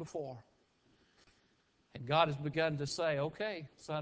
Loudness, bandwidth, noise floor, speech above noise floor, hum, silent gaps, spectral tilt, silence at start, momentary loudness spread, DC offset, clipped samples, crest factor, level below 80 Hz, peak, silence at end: -36 LUFS; 8 kHz; -73 dBFS; 37 dB; none; none; -5 dB/octave; 0 s; 17 LU; under 0.1%; under 0.1%; 22 dB; -70 dBFS; -16 dBFS; 0 s